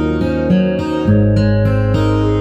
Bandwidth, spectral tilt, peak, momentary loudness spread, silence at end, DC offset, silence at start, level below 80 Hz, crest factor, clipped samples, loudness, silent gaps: 8.2 kHz; -9 dB/octave; -2 dBFS; 4 LU; 0 s; under 0.1%; 0 s; -26 dBFS; 10 dB; under 0.1%; -14 LUFS; none